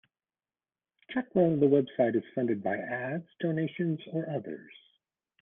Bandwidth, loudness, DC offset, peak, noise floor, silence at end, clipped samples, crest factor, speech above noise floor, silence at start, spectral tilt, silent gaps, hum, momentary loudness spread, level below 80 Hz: 3.8 kHz; -30 LUFS; under 0.1%; -12 dBFS; under -90 dBFS; 0.7 s; under 0.1%; 18 dB; over 61 dB; 1.1 s; -11 dB/octave; none; none; 12 LU; -74 dBFS